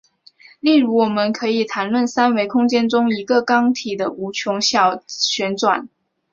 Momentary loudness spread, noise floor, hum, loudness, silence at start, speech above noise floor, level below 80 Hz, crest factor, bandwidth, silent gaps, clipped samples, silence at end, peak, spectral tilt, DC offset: 7 LU; -49 dBFS; none; -18 LUFS; 0.65 s; 31 dB; -64 dBFS; 16 dB; 7.4 kHz; none; under 0.1%; 0.45 s; -2 dBFS; -3.5 dB/octave; under 0.1%